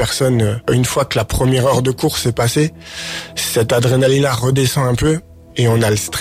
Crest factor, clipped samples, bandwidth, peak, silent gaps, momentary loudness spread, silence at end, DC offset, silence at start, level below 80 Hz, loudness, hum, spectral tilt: 12 dB; under 0.1%; 16 kHz; -4 dBFS; none; 7 LU; 0 s; under 0.1%; 0 s; -36 dBFS; -16 LUFS; none; -5 dB/octave